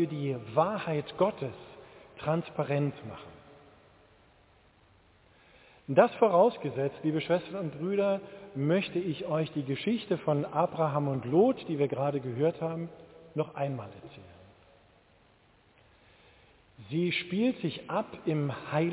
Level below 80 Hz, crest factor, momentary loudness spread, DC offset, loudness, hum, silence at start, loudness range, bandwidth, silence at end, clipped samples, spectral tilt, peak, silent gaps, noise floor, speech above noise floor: -68 dBFS; 24 dB; 17 LU; under 0.1%; -30 LUFS; none; 0 s; 11 LU; 4 kHz; 0 s; under 0.1%; -6 dB/octave; -8 dBFS; none; -63 dBFS; 34 dB